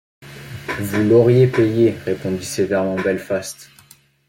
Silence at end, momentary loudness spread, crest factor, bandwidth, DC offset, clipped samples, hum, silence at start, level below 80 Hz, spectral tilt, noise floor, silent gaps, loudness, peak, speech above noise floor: 0.65 s; 19 LU; 16 dB; 16.5 kHz; under 0.1%; under 0.1%; none; 0.2 s; -54 dBFS; -6.5 dB/octave; -50 dBFS; none; -18 LUFS; -2 dBFS; 33 dB